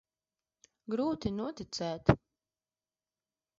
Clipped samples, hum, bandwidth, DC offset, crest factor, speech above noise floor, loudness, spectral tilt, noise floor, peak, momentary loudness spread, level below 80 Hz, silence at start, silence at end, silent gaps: under 0.1%; none; 7.6 kHz; under 0.1%; 28 dB; over 58 dB; -34 LUFS; -6 dB/octave; under -90 dBFS; -8 dBFS; 9 LU; -54 dBFS; 0.9 s; 1.45 s; none